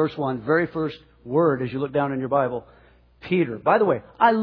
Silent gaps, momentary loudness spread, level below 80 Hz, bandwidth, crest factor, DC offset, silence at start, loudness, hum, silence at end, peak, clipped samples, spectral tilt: none; 10 LU; -58 dBFS; 5.4 kHz; 18 dB; under 0.1%; 0 s; -23 LUFS; none; 0 s; -4 dBFS; under 0.1%; -9.5 dB/octave